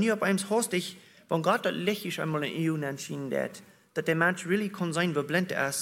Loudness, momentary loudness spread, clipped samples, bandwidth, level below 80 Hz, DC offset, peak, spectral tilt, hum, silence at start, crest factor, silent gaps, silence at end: -29 LUFS; 8 LU; under 0.1%; 16.5 kHz; -76 dBFS; under 0.1%; -10 dBFS; -4.5 dB/octave; none; 0 s; 20 dB; none; 0 s